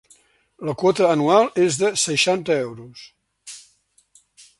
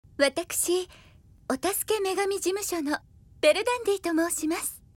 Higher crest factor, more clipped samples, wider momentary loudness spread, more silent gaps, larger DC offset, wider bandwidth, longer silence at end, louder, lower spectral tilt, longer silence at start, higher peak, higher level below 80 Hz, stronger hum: about the same, 20 dB vs 20 dB; neither; first, 22 LU vs 8 LU; neither; neither; second, 11.5 kHz vs 18 kHz; first, 1 s vs 0.2 s; first, -19 LUFS vs -27 LUFS; first, -3.5 dB/octave vs -2 dB/octave; first, 0.6 s vs 0.2 s; first, -2 dBFS vs -8 dBFS; second, -64 dBFS vs -58 dBFS; neither